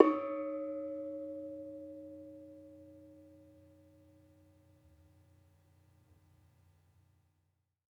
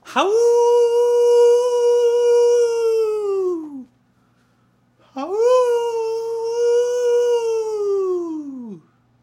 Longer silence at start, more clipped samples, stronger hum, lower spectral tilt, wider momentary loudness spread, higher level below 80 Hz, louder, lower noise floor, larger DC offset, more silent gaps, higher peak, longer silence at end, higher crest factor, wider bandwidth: about the same, 0 s vs 0.05 s; neither; neither; first, -8 dB/octave vs -3 dB/octave; first, 23 LU vs 15 LU; second, -82 dBFS vs -76 dBFS; second, -40 LUFS vs -17 LUFS; first, -80 dBFS vs -60 dBFS; neither; neither; second, -8 dBFS vs -4 dBFS; first, 4.6 s vs 0.45 s; first, 34 dB vs 14 dB; second, 5.6 kHz vs 12 kHz